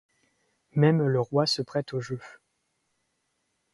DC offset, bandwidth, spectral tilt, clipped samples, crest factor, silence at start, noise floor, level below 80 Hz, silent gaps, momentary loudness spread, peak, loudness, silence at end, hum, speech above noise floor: under 0.1%; 11.5 kHz; -6.5 dB/octave; under 0.1%; 20 dB; 0.75 s; -76 dBFS; -68 dBFS; none; 13 LU; -8 dBFS; -26 LUFS; 1.45 s; none; 51 dB